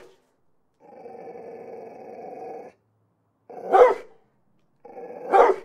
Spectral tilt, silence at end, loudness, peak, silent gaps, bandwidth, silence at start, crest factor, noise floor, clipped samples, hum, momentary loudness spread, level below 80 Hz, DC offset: -5 dB/octave; 0.05 s; -19 LUFS; -2 dBFS; none; 9.6 kHz; 1.25 s; 24 dB; -69 dBFS; under 0.1%; none; 25 LU; -66 dBFS; under 0.1%